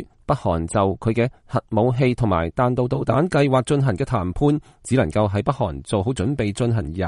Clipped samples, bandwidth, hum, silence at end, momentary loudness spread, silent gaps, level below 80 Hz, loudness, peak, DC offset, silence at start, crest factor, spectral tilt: under 0.1%; 11.5 kHz; none; 0 s; 5 LU; none; -40 dBFS; -21 LUFS; -2 dBFS; under 0.1%; 0 s; 18 dB; -7 dB/octave